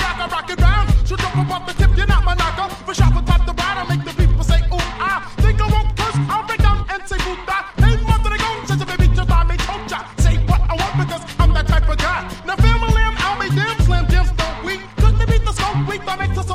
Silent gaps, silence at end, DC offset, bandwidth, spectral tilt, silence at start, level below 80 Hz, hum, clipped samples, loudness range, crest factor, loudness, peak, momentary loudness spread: none; 0 s; under 0.1%; 13 kHz; -5.5 dB/octave; 0 s; -18 dBFS; none; under 0.1%; 1 LU; 16 dB; -18 LUFS; 0 dBFS; 7 LU